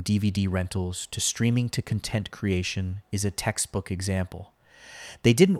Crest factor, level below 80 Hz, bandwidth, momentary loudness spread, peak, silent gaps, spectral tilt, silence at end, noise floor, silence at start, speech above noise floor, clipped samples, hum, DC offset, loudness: 22 dB; -50 dBFS; 15 kHz; 8 LU; -4 dBFS; none; -5 dB/octave; 0 s; -47 dBFS; 0 s; 21 dB; under 0.1%; none; under 0.1%; -27 LUFS